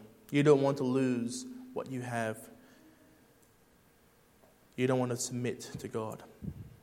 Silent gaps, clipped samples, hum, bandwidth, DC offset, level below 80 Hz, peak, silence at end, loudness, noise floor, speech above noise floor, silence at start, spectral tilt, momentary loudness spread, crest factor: none; under 0.1%; none; 16.5 kHz; under 0.1%; -66 dBFS; -12 dBFS; 0.05 s; -32 LUFS; -65 dBFS; 33 dB; 0 s; -6 dB/octave; 19 LU; 22 dB